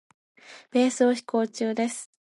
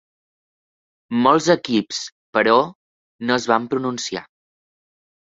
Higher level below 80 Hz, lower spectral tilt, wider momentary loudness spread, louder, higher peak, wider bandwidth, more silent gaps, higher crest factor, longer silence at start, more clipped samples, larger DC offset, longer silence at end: second, -82 dBFS vs -64 dBFS; about the same, -4 dB/octave vs -4 dB/octave; second, 7 LU vs 12 LU; second, -25 LUFS vs -20 LUFS; second, -8 dBFS vs -2 dBFS; first, 11.5 kHz vs 8 kHz; second, none vs 2.12-2.33 s, 2.75-3.19 s; about the same, 18 dB vs 20 dB; second, 0.5 s vs 1.1 s; neither; neither; second, 0.25 s vs 1 s